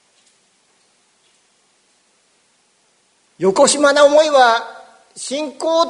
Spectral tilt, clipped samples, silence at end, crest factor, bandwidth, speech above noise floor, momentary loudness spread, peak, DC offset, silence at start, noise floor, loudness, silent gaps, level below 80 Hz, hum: -2.5 dB/octave; under 0.1%; 0 s; 18 dB; 11 kHz; 46 dB; 14 LU; 0 dBFS; under 0.1%; 3.4 s; -59 dBFS; -14 LUFS; none; -66 dBFS; none